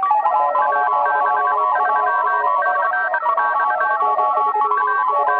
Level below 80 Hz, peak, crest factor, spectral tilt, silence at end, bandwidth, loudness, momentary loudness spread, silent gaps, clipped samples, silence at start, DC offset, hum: -86 dBFS; -6 dBFS; 12 dB; -4.5 dB/octave; 0 s; 4.9 kHz; -17 LUFS; 1 LU; none; under 0.1%; 0 s; under 0.1%; 60 Hz at -70 dBFS